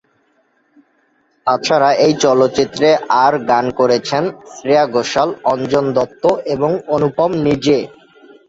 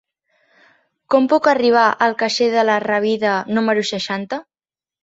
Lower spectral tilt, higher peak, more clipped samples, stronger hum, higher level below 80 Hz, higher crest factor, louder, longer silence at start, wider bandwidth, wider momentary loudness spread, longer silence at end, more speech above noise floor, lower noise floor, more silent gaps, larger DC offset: about the same, -5 dB/octave vs -4 dB/octave; about the same, 0 dBFS vs -2 dBFS; neither; neither; first, -52 dBFS vs -66 dBFS; about the same, 14 dB vs 16 dB; about the same, -15 LUFS vs -17 LUFS; first, 1.45 s vs 1.1 s; about the same, 8 kHz vs 8 kHz; second, 6 LU vs 9 LU; about the same, 0.6 s vs 0.6 s; second, 45 dB vs over 74 dB; second, -59 dBFS vs under -90 dBFS; neither; neither